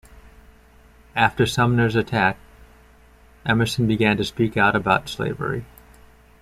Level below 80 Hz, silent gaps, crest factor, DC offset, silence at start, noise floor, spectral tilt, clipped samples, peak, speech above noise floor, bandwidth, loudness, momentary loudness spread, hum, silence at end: -46 dBFS; none; 20 dB; under 0.1%; 1.15 s; -51 dBFS; -6 dB/octave; under 0.1%; -4 dBFS; 31 dB; 14.5 kHz; -21 LUFS; 10 LU; none; 0.75 s